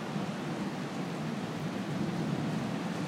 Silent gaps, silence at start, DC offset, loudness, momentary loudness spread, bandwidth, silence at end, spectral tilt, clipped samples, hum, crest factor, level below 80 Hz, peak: none; 0 s; under 0.1%; -35 LUFS; 3 LU; 16 kHz; 0 s; -6 dB/octave; under 0.1%; none; 14 dB; -66 dBFS; -20 dBFS